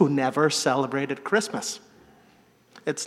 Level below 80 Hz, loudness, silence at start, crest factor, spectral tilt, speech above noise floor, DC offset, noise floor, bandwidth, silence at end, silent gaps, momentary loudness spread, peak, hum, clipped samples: -74 dBFS; -25 LUFS; 0 s; 20 dB; -4 dB/octave; 34 dB; under 0.1%; -58 dBFS; 15 kHz; 0 s; none; 11 LU; -6 dBFS; none; under 0.1%